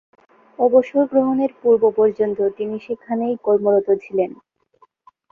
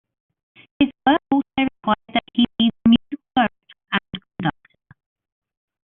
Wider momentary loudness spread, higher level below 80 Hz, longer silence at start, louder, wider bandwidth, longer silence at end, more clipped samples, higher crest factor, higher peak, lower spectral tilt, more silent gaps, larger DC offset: about the same, 10 LU vs 9 LU; second, -64 dBFS vs -52 dBFS; second, 0.6 s vs 0.8 s; about the same, -19 LUFS vs -21 LUFS; first, 4.6 kHz vs 4 kHz; second, 1.05 s vs 1.4 s; neither; about the same, 16 dB vs 18 dB; about the same, -2 dBFS vs -4 dBFS; first, -9.5 dB/octave vs -3 dB/octave; neither; neither